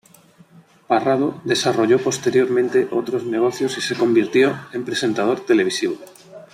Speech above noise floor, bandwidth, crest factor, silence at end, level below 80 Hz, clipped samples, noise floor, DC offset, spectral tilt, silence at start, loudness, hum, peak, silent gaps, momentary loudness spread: 32 dB; 14.5 kHz; 16 dB; 0.1 s; -64 dBFS; under 0.1%; -50 dBFS; under 0.1%; -4.5 dB/octave; 0.9 s; -19 LUFS; none; -4 dBFS; none; 6 LU